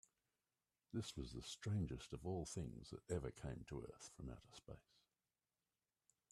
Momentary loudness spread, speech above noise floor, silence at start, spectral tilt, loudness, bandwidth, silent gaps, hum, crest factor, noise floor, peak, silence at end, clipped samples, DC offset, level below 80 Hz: 14 LU; over 41 dB; 0.95 s; -5.5 dB/octave; -50 LUFS; 13 kHz; none; none; 22 dB; under -90 dBFS; -30 dBFS; 1.5 s; under 0.1%; under 0.1%; -64 dBFS